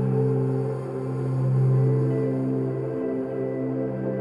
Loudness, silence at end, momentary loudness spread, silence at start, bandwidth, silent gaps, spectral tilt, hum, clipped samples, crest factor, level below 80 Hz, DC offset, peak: -25 LUFS; 0 s; 7 LU; 0 s; 2.8 kHz; none; -11 dB/octave; none; under 0.1%; 12 dB; -60 dBFS; under 0.1%; -12 dBFS